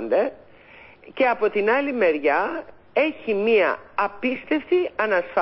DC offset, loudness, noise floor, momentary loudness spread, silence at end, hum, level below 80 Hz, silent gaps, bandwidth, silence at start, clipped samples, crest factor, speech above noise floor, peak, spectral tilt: under 0.1%; -22 LUFS; -48 dBFS; 8 LU; 0 s; none; -62 dBFS; none; 5.8 kHz; 0 s; under 0.1%; 14 dB; 26 dB; -8 dBFS; -9 dB/octave